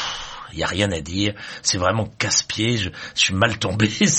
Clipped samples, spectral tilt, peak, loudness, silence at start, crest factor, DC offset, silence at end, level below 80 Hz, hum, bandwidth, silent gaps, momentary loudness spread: under 0.1%; -3 dB/octave; -2 dBFS; -21 LUFS; 0 s; 20 dB; under 0.1%; 0 s; -46 dBFS; none; 8.8 kHz; none; 8 LU